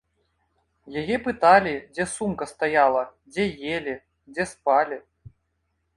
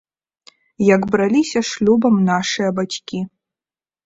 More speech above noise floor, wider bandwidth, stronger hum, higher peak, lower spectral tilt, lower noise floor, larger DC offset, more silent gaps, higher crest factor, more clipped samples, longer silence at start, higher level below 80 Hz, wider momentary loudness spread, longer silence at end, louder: second, 51 dB vs over 74 dB; first, 11.5 kHz vs 8 kHz; neither; about the same, -4 dBFS vs -2 dBFS; about the same, -4.5 dB/octave vs -5.5 dB/octave; second, -74 dBFS vs under -90 dBFS; neither; neither; first, 22 dB vs 16 dB; neither; about the same, 0.85 s vs 0.8 s; about the same, -56 dBFS vs -56 dBFS; first, 16 LU vs 11 LU; first, 0.95 s vs 0.8 s; second, -23 LUFS vs -17 LUFS